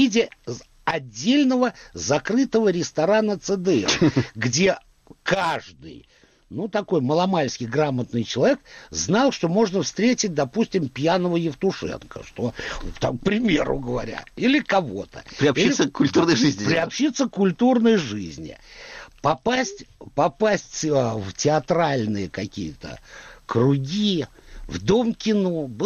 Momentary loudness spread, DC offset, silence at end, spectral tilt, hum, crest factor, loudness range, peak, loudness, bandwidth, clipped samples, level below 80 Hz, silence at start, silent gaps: 14 LU; under 0.1%; 0 s; -5 dB/octave; none; 14 dB; 4 LU; -8 dBFS; -22 LUFS; 8.6 kHz; under 0.1%; -48 dBFS; 0 s; none